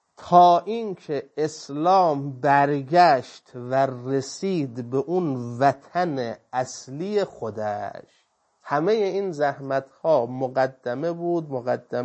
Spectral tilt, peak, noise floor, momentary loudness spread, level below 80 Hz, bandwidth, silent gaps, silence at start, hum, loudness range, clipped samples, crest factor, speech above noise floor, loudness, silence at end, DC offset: -6 dB/octave; -4 dBFS; -63 dBFS; 12 LU; -72 dBFS; 8.6 kHz; none; 0.2 s; none; 6 LU; under 0.1%; 20 dB; 40 dB; -23 LUFS; 0 s; under 0.1%